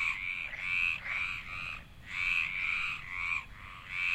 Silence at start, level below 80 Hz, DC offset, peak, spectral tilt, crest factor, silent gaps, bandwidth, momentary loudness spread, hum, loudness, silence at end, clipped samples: 0 s; -54 dBFS; under 0.1%; -18 dBFS; -2 dB/octave; 18 dB; none; 16 kHz; 11 LU; none; -33 LUFS; 0 s; under 0.1%